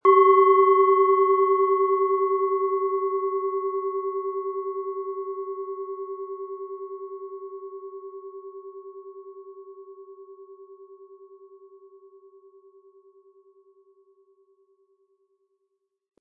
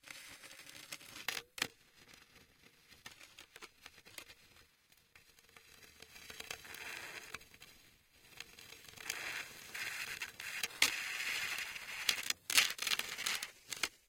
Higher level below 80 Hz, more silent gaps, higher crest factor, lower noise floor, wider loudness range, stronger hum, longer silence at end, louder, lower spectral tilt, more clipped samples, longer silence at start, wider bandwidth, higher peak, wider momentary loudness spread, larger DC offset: second, under -90 dBFS vs -76 dBFS; neither; second, 20 dB vs 34 dB; first, -77 dBFS vs -70 dBFS; first, 25 LU vs 22 LU; neither; first, 4.65 s vs 0.15 s; first, -23 LUFS vs -38 LUFS; first, -6.5 dB/octave vs 1 dB/octave; neither; about the same, 0.05 s vs 0.05 s; second, 3.3 kHz vs 17 kHz; first, -6 dBFS vs -10 dBFS; about the same, 26 LU vs 24 LU; neither